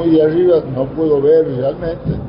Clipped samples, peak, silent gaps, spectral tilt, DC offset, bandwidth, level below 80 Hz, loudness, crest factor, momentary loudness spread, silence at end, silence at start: under 0.1%; -4 dBFS; none; -13.5 dB/octave; under 0.1%; 5.4 kHz; -38 dBFS; -14 LUFS; 10 dB; 9 LU; 0 s; 0 s